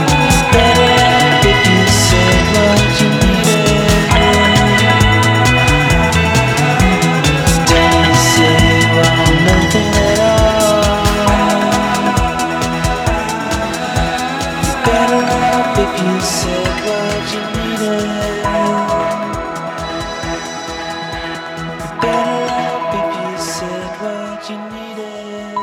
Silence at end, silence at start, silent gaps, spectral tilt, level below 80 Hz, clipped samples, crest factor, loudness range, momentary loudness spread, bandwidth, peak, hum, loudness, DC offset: 0 s; 0 s; none; -4.5 dB/octave; -24 dBFS; under 0.1%; 12 dB; 9 LU; 13 LU; 19 kHz; 0 dBFS; none; -12 LUFS; under 0.1%